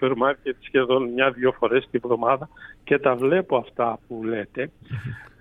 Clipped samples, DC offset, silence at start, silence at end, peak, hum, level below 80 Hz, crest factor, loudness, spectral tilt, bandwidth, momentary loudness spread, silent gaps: under 0.1%; under 0.1%; 0 s; 0.1 s; -6 dBFS; none; -56 dBFS; 18 dB; -23 LUFS; -7.5 dB/octave; 10.5 kHz; 13 LU; none